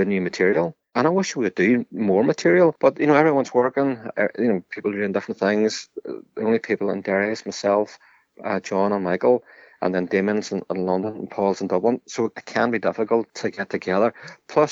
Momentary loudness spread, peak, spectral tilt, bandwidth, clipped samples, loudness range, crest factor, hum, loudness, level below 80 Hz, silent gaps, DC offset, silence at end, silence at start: 9 LU; -4 dBFS; -6 dB/octave; 8 kHz; under 0.1%; 5 LU; 18 dB; none; -22 LUFS; -70 dBFS; none; under 0.1%; 0 s; 0 s